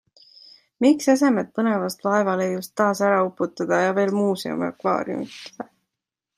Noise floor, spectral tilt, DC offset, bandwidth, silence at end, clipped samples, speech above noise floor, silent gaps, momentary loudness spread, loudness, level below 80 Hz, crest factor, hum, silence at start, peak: -85 dBFS; -5.5 dB/octave; under 0.1%; 15.5 kHz; 0.75 s; under 0.1%; 64 dB; none; 12 LU; -22 LUFS; -70 dBFS; 18 dB; none; 0.8 s; -6 dBFS